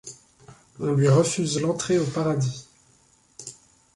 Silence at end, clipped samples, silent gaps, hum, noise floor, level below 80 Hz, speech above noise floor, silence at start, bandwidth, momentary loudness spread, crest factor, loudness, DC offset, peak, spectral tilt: 0.45 s; under 0.1%; none; none; -60 dBFS; -60 dBFS; 38 dB; 0.05 s; 11.5 kHz; 21 LU; 16 dB; -23 LUFS; under 0.1%; -8 dBFS; -5.5 dB/octave